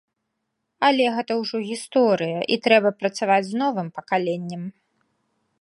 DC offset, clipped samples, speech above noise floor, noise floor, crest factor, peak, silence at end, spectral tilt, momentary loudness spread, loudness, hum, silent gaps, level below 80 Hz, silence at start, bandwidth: under 0.1%; under 0.1%; 56 dB; -78 dBFS; 22 dB; -2 dBFS; 0.9 s; -5 dB/octave; 11 LU; -22 LUFS; none; none; -76 dBFS; 0.8 s; 11.5 kHz